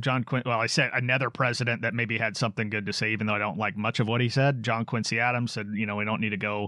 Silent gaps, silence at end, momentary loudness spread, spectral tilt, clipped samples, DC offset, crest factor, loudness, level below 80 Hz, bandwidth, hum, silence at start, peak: none; 0 s; 5 LU; -5 dB/octave; under 0.1%; under 0.1%; 16 dB; -27 LUFS; -72 dBFS; 11.5 kHz; none; 0 s; -10 dBFS